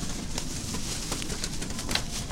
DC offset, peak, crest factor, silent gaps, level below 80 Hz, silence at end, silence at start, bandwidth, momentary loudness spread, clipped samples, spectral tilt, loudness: under 0.1%; -6 dBFS; 26 dB; none; -38 dBFS; 0 s; 0 s; 17 kHz; 4 LU; under 0.1%; -3 dB/octave; -32 LUFS